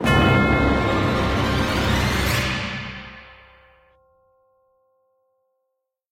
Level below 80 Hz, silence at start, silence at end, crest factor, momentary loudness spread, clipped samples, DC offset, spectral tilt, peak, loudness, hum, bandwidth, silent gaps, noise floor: -32 dBFS; 0 s; 2.8 s; 18 dB; 17 LU; under 0.1%; under 0.1%; -5.5 dB/octave; -4 dBFS; -20 LUFS; none; 16.5 kHz; none; -78 dBFS